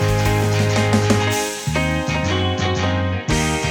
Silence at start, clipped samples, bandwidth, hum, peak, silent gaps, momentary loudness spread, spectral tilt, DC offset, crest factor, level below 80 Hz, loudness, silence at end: 0 s; under 0.1%; 19.5 kHz; none; -2 dBFS; none; 4 LU; -5 dB/octave; under 0.1%; 16 dB; -32 dBFS; -19 LUFS; 0 s